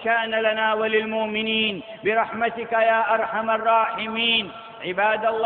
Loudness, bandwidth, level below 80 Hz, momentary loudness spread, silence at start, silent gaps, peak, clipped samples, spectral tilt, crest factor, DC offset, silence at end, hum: -22 LUFS; 4.4 kHz; -64 dBFS; 5 LU; 0 s; none; -6 dBFS; under 0.1%; -8 dB/octave; 16 dB; under 0.1%; 0 s; none